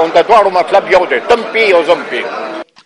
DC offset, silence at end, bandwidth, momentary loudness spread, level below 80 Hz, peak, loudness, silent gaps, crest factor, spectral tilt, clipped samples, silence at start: under 0.1%; 0.2 s; 11 kHz; 11 LU; -48 dBFS; 0 dBFS; -10 LUFS; none; 10 dB; -3.5 dB/octave; 0.2%; 0 s